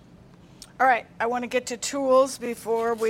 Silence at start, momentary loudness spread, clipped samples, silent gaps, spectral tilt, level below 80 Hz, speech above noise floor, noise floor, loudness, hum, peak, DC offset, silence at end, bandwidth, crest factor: 0.8 s; 7 LU; under 0.1%; none; -3 dB/octave; -62 dBFS; 27 dB; -50 dBFS; -24 LUFS; none; -8 dBFS; under 0.1%; 0 s; 16.5 kHz; 18 dB